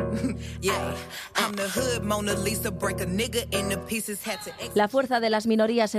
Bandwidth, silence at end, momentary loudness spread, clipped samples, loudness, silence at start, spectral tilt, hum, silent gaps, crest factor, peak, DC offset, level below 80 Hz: 14.5 kHz; 0 s; 7 LU; under 0.1%; -27 LUFS; 0 s; -4 dB/octave; none; none; 16 dB; -10 dBFS; under 0.1%; -48 dBFS